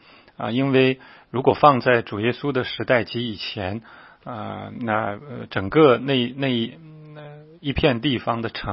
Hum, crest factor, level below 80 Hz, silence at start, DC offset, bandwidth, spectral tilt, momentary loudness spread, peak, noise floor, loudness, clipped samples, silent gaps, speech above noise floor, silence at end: none; 22 dB; -48 dBFS; 0.4 s; under 0.1%; 5.8 kHz; -10.5 dB/octave; 17 LU; 0 dBFS; -41 dBFS; -21 LUFS; under 0.1%; none; 20 dB; 0 s